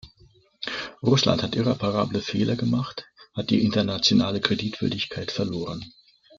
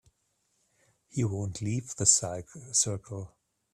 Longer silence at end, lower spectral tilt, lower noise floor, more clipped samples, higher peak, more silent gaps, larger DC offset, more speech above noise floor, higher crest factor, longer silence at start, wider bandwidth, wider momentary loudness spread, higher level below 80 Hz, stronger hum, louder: about the same, 0.5 s vs 0.45 s; first, -5.5 dB/octave vs -3.5 dB/octave; second, -57 dBFS vs -75 dBFS; neither; first, -2 dBFS vs -6 dBFS; neither; neither; second, 34 dB vs 45 dB; about the same, 22 dB vs 26 dB; second, 0.05 s vs 1.15 s; second, 7.6 kHz vs 14.5 kHz; second, 14 LU vs 19 LU; first, -56 dBFS vs -62 dBFS; neither; first, -24 LUFS vs -28 LUFS